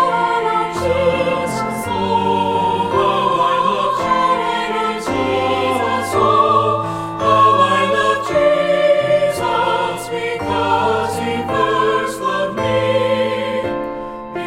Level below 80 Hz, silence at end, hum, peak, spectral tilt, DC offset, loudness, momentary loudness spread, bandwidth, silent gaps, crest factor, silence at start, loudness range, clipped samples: -46 dBFS; 0 s; none; 0 dBFS; -5 dB/octave; under 0.1%; -16 LUFS; 7 LU; 16 kHz; none; 16 dB; 0 s; 3 LU; under 0.1%